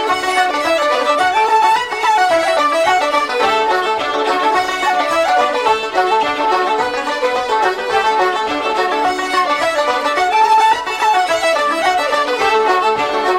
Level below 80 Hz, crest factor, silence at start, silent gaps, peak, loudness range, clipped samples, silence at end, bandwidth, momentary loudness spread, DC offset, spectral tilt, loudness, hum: -50 dBFS; 12 dB; 0 s; none; -2 dBFS; 2 LU; under 0.1%; 0 s; 16 kHz; 4 LU; under 0.1%; -1.5 dB/octave; -14 LUFS; none